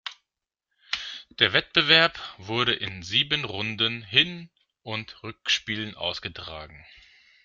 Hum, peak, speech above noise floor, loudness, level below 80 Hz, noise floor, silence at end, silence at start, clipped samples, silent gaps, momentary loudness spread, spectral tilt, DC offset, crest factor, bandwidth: none; -2 dBFS; 60 dB; -24 LUFS; -60 dBFS; -86 dBFS; 0.65 s; 0.05 s; under 0.1%; none; 20 LU; -3 dB/octave; under 0.1%; 26 dB; 13.5 kHz